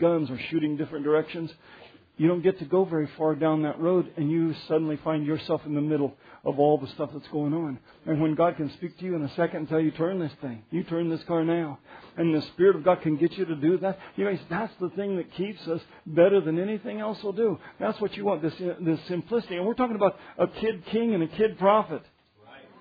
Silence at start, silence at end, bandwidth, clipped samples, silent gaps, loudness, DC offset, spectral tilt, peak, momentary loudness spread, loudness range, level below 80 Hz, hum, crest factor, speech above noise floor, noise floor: 0 s; 0.2 s; 5 kHz; under 0.1%; none; -27 LUFS; under 0.1%; -10 dB/octave; -8 dBFS; 10 LU; 3 LU; -66 dBFS; none; 20 dB; 26 dB; -53 dBFS